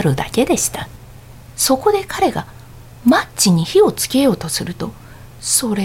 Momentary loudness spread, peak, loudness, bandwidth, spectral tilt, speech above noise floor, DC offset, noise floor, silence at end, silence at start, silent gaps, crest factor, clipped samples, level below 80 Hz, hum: 15 LU; -2 dBFS; -16 LUFS; 16.5 kHz; -4 dB/octave; 22 dB; under 0.1%; -38 dBFS; 0 s; 0 s; none; 16 dB; under 0.1%; -42 dBFS; none